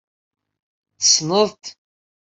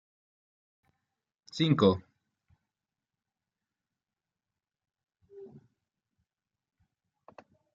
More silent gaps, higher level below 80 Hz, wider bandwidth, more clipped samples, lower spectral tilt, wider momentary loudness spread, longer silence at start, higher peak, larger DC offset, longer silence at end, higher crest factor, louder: neither; first, -68 dBFS vs -76 dBFS; first, 8.4 kHz vs 7.2 kHz; neither; second, -2 dB/octave vs -6 dB/octave; second, 23 LU vs 27 LU; second, 1 s vs 1.55 s; first, -2 dBFS vs -10 dBFS; neither; second, 0.6 s vs 2.3 s; second, 22 dB vs 28 dB; first, -16 LUFS vs -27 LUFS